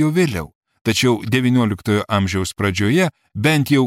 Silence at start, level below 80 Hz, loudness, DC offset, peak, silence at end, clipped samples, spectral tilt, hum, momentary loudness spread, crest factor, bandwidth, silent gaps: 0 s; -46 dBFS; -18 LUFS; under 0.1%; -4 dBFS; 0 s; under 0.1%; -5.5 dB/octave; none; 5 LU; 14 dB; 16 kHz; 0.55-0.61 s, 0.81-0.85 s